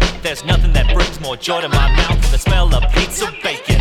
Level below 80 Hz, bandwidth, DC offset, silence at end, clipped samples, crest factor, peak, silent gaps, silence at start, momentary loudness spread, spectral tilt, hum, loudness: -16 dBFS; 14 kHz; under 0.1%; 0 s; under 0.1%; 12 dB; 0 dBFS; none; 0 s; 5 LU; -4.5 dB/octave; none; -16 LUFS